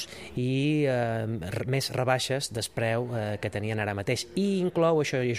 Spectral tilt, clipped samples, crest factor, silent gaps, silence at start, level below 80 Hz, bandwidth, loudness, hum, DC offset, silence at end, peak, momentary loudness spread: -5.5 dB/octave; under 0.1%; 18 dB; none; 0 s; -58 dBFS; 15.5 kHz; -28 LUFS; none; under 0.1%; 0 s; -10 dBFS; 7 LU